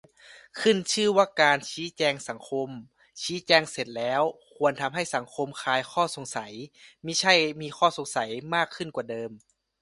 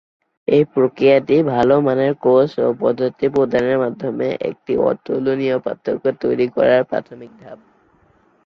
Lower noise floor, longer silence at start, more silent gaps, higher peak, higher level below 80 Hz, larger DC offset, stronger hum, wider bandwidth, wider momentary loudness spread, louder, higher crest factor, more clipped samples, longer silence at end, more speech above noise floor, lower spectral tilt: about the same, -53 dBFS vs -56 dBFS; second, 0.3 s vs 0.5 s; neither; about the same, -4 dBFS vs -2 dBFS; second, -70 dBFS vs -56 dBFS; neither; neither; first, 11.5 kHz vs 6.8 kHz; first, 14 LU vs 7 LU; second, -26 LUFS vs -17 LUFS; first, 24 dB vs 16 dB; neither; second, 0.45 s vs 0.9 s; second, 26 dB vs 39 dB; second, -3 dB/octave vs -8.5 dB/octave